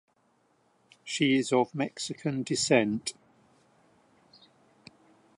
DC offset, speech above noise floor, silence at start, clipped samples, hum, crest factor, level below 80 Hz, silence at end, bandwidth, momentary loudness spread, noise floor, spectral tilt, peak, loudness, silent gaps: under 0.1%; 42 dB; 1.05 s; under 0.1%; none; 22 dB; -74 dBFS; 2.25 s; 11.5 kHz; 11 LU; -69 dBFS; -4 dB/octave; -10 dBFS; -28 LUFS; none